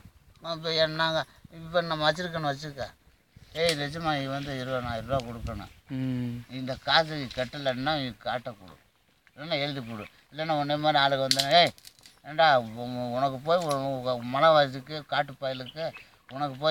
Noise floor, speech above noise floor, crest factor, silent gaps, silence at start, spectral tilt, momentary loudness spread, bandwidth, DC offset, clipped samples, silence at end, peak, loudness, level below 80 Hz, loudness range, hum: -64 dBFS; 36 dB; 26 dB; none; 0.05 s; -4.5 dB/octave; 16 LU; 17 kHz; under 0.1%; under 0.1%; 0 s; -4 dBFS; -28 LUFS; -56 dBFS; 7 LU; none